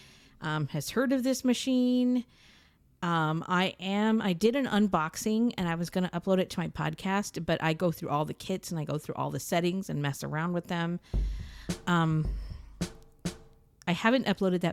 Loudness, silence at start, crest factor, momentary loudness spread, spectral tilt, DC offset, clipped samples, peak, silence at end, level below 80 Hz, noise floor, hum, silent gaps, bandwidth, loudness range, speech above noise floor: -30 LUFS; 0.4 s; 20 dB; 12 LU; -5.5 dB/octave; under 0.1%; under 0.1%; -10 dBFS; 0 s; -46 dBFS; -56 dBFS; none; none; 16 kHz; 4 LU; 27 dB